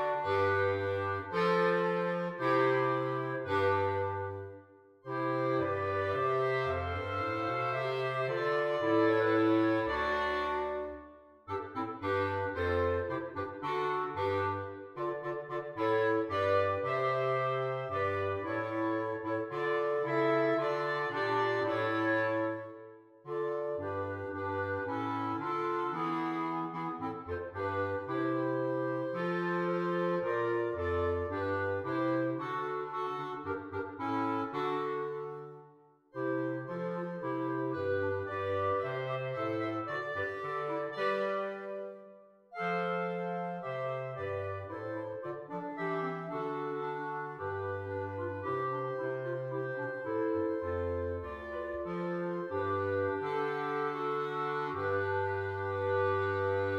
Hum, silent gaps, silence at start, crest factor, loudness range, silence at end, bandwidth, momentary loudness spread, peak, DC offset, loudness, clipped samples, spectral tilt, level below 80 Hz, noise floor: none; none; 0 s; 18 dB; 6 LU; 0 s; 9.4 kHz; 9 LU; -16 dBFS; under 0.1%; -34 LUFS; under 0.1%; -7.5 dB/octave; -62 dBFS; -61 dBFS